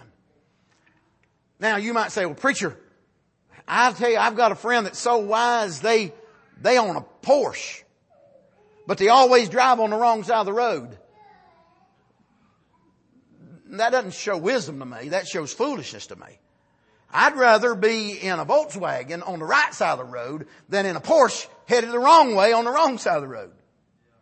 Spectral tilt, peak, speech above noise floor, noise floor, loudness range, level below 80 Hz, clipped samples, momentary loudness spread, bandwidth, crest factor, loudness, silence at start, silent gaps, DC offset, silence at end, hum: -3.5 dB/octave; -4 dBFS; 45 dB; -66 dBFS; 9 LU; -72 dBFS; under 0.1%; 16 LU; 8.8 kHz; 20 dB; -21 LUFS; 1.6 s; none; under 0.1%; 0.75 s; none